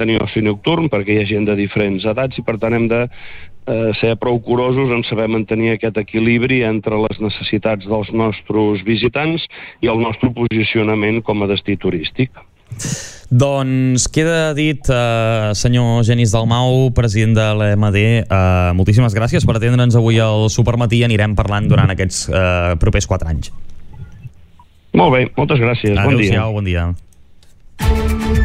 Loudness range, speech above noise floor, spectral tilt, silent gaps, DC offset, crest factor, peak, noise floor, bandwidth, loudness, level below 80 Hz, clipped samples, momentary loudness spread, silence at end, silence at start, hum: 4 LU; 30 dB; -6 dB/octave; none; under 0.1%; 14 dB; -2 dBFS; -44 dBFS; 12 kHz; -15 LUFS; -30 dBFS; under 0.1%; 7 LU; 0 s; 0 s; none